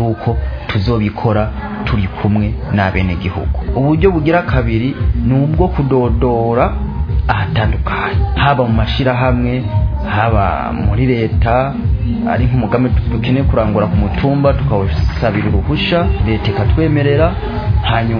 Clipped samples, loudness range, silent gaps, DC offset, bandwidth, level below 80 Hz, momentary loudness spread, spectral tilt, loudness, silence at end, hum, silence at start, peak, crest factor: under 0.1%; 1 LU; none; under 0.1%; 5.4 kHz; -20 dBFS; 5 LU; -9.5 dB/octave; -14 LUFS; 0 s; none; 0 s; 0 dBFS; 14 dB